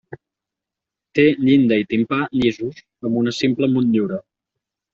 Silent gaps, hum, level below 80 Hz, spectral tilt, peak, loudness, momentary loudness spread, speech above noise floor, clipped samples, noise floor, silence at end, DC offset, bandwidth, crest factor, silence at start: none; none; -56 dBFS; -5.5 dB/octave; -4 dBFS; -18 LUFS; 13 LU; 68 dB; under 0.1%; -86 dBFS; 0.75 s; under 0.1%; 7.6 kHz; 16 dB; 0.1 s